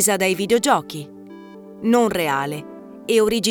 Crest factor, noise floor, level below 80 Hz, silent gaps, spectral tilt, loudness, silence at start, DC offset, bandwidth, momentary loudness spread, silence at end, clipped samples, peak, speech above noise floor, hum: 16 dB; -39 dBFS; -56 dBFS; none; -3.5 dB/octave; -19 LUFS; 0 s; under 0.1%; over 20 kHz; 22 LU; 0 s; under 0.1%; -4 dBFS; 21 dB; none